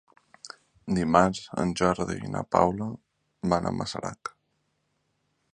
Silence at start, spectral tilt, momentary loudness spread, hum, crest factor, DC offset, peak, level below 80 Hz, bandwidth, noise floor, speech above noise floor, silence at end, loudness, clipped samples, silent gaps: 0.45 s; -6 dB/octave; 21 LU; none; 26 dB; under 0.1%; -4 dBFS; -52 dBFS; 10.5 kHz; -75 dBFS; 48 dB; 1.25 s; -27 LUFS; under 0.1%; none